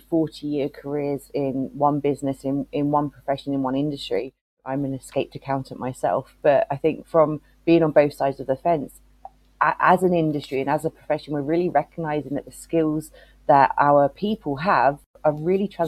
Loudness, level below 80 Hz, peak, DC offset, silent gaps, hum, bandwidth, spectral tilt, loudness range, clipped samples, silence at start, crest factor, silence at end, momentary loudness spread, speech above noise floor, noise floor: -23 LUFS; -54 dBFS; -2 dBFS; under 0.1%; 4.41-4.57 s, 15.06-15.14 s; none; 14 kHz; -7 dB/octave; 5 LU; under 0.1%; 0.1 s; 20 dB; 0 s; 11 LU; 25 dB; -47 dBFS